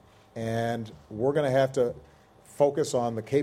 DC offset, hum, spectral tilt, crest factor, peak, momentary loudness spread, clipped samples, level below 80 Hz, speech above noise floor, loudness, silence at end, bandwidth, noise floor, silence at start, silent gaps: under 0.1%; none; -6 dB/octave; 18 dB; -10 dBFS; 13 LU; under 0.1%; -62 dBFS; 28 dB; -27 LUFS; 0 s; 15.5 kHz; -54 dBFS; 0.35 s; none